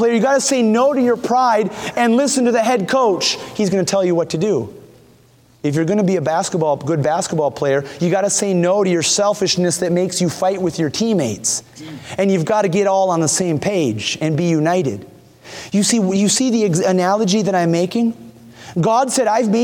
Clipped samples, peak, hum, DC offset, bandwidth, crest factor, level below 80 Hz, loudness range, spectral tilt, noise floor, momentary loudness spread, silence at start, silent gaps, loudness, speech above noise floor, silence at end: under 0.1%; -4 dBFS; none; under 0.1%; 18 kHz; 14 dB; -58 dBFS; 3 LU; -4.5 dB/octave; -50 dBFS; 5 LU; 0 s; none; -17 LUFS; 34 dB; 0 s